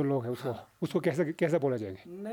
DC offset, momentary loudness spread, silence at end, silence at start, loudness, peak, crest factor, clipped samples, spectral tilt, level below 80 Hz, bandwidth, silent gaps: under 0.1%; 10 LU; 0 s; 0 s; -32 LUFS; -16 dBFS; 16 dB; under 0.1%; -7.5 dB/octave; -72 dBFS; 19 kHz; none